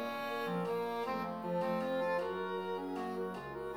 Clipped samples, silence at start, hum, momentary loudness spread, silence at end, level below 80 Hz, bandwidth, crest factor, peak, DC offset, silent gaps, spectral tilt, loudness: under 0.1%; 0 s; none; 5 LU; 0 s; -72 dBFS; over 20 kHz; 12 dB; -24 dBFS; under 0.1%; none; -6.5 dB/octave; -37 LUFS